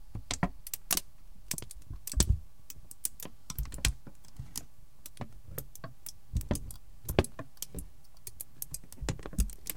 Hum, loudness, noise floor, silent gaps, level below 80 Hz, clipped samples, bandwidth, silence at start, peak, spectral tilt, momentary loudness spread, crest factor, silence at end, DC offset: none; -37 LUFS; -54 dBFS; none; -42 dBFS; under 0.1%; 17 kHz; 0 s; -6 dBFS; -3.5 dB/octave; 17 LU; 32 dB; 0 s; 0.7%